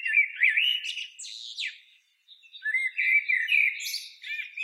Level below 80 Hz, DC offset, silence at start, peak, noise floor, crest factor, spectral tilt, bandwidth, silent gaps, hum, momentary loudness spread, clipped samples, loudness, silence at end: under -90 dBFS; under 0.1%; 0 s; -10 dBFS; -61 dBFS; 18 dB; 12.5 dB/octave; 16 kHz; none; none; 14 LU; under 0.1%; -25 LUFS; 0 s